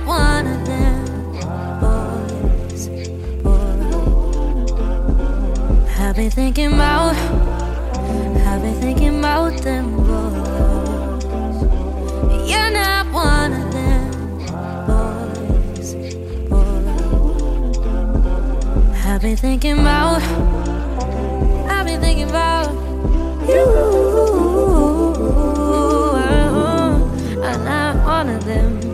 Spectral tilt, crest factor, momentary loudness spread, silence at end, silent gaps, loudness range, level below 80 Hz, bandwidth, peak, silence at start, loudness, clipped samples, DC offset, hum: -6 dB/octave; 14 dB; 8 LU; 0 s; none; 5 LU; -18 dBFS; 13.5 kHz; -2 dBFS; 0 s; -18 LUFS; under 0.1%; under 0.1%; none